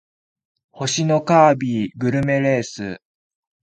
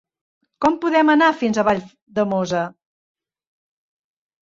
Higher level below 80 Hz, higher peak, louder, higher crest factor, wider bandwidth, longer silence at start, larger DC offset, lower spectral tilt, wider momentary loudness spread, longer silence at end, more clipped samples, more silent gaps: about the same, -56 dBFS vs -60 dBFS; first, 0 dBFS vs -4 dBFS; about the same, -18 LUFS vs -19 LUFS; about the same, 20 dB vs 18 dB; first, 9.4 kHz vs 7.6 kHz; first, 0.75 s vs 0.6 s; neither; about the same, -5.5 dB/octave vs -5.5 dB/octave; first, 16 LU vs 10 LU; second, 0.65 s vs 1.7 s; neither; second, none vs 2.02-2.07 s